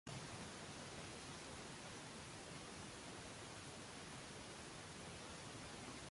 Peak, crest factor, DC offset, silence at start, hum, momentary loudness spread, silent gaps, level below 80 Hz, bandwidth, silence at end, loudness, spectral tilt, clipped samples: -38 dBFS; 16 dB; under 0.1%; 0.05 s; none; 1 LU; none; -70 dBFS; 11.5 kHz; 0 s; -53 LUFS; -3 dB/octave; under 0.1%